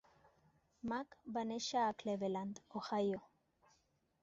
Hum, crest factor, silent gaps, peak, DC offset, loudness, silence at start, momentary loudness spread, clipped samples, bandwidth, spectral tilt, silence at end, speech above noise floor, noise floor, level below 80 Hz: none; 16 dB; none; -26 dBFS; under 0.1%; -41 LUFS; 0.85 s; 9 LU; under 0.1%; 7.8 kHz; -4 dB/octave; 1 s; 38 dB; -78 dBFS; -78 dBFS